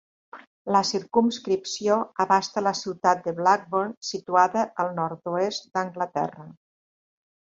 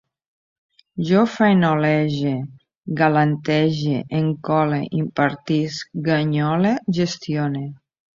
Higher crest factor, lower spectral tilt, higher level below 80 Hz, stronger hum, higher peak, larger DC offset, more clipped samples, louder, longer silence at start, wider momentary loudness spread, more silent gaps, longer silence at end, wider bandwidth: about the same, 20 dB vs 18 dB; second, -4 dB/octave vs -7 dB/octave; second, -70 dBFS vs -58 dBFS; neither; second, -6 dBFS vs -2 dBFS; neither; neither; second, -25 LUFS vs -20 LUFS; second, 0.35 s vs 0.95 s; second, 8 LU vs 12 LU; first, 0.47-0.65 s, 3.97-4.01 s vs 2.77-2.83 s; first, 0.95 s vs 0.45 s; about the same, 8 kHz vs 7.4 kHz